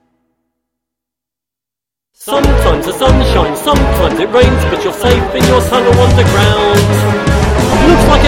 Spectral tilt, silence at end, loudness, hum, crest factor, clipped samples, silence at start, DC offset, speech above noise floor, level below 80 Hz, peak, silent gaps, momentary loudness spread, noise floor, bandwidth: -5.5 dB/octave; 0 s; -10 LUFS; none; 10 dB; under 0.1%; 2.2 s; under 0.1%; 76 dB; -18 dBFS; 0 dBFS; none; 5 LU; -85 dBFS; 17.5 kHz